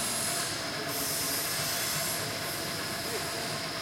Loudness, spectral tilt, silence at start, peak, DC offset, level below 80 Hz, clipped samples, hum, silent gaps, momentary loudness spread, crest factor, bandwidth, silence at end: -30 LUFS; -1.5 dB/octave; 0 s; -18 dBFS; under 0.1%; -62 dBFS; under 0.1%; none; none; 4 LU; 14 dB; 16.5 kHz; 0 s